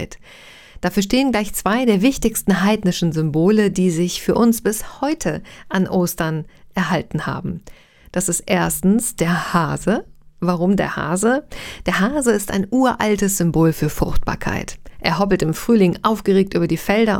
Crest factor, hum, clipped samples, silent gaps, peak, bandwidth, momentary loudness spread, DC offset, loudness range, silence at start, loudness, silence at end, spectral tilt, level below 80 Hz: 18 dB; none; under 0.1%; none; 0 dBFS; 17.5 kHz; 9 LU; under 0.1%; 4 LU; 0 s; -19 LUFS; 0 s; -5 dB/octave; -36 dBFS